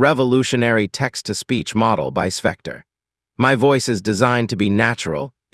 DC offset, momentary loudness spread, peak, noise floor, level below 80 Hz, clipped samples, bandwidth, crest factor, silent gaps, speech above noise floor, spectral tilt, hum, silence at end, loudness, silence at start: under 0.1%; 9 LU; 0 dBFS; -79 dBFS; -54 dBFS; under 0.1%; 12 kHz; 18 dB; none; 61 dB; -5 dB/octave; none; 0.25 s; -18 LUFS; 0 s